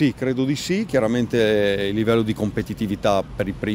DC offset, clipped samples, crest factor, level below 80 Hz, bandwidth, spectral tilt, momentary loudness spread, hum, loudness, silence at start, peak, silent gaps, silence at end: under 0.1%; under 0.1%; 16 dB; -44 dBFS; 16 kHz; -6 dB/octave; 7 LU; none; -21 LUFS; 0 s; -4 dBFS; none; 0 s